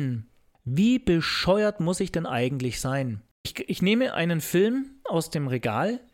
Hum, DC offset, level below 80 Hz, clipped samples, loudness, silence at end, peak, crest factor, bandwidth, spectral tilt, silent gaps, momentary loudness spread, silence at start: none; under 0.1%; -50 dBFS; under 0.1%; -25 LUFS; 0.15 s; -10 dBFS; 16 dB; 17 kHz; -5.5 dB/octave; 3.31-3.44 s; 10 LU; 0 s